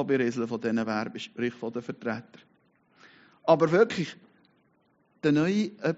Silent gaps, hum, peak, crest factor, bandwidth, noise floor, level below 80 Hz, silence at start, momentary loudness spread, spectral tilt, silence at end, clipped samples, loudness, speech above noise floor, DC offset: none; none; -6 dBFS; 22 dB; 7.6 kHz; -68 dBFS; -70 dBFS; 0 s; 13 LU; -5.5 dB/octave; 0 s; under 0.1%; -28 LUFS; 41 dB; under 0.1%